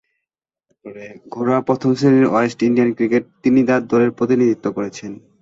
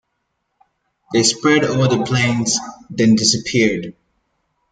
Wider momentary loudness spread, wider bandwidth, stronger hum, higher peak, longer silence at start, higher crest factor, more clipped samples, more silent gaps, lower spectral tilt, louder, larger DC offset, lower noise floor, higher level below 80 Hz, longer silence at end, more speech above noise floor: first, 19 LU vs 8 LU; second, 7.8 kHz vs 9.6 kHz; neither; about the same, -2 dBFS vs -2 dBFS; second, 0.85 s vs 1.1 s; about the same, 16 dB vs 16 dB; neither; neither; first, -7.5 dB/octave vs -4 dB/octave; about the same, -17 LUFS vs -16 LUFS; neither; first, -83 dBFS vs -72 dBFS; about the same, -58 dBFS vs -54 dBFS; second, 0.25 s vs 0.8 s; first, 67 dB vs 56 dB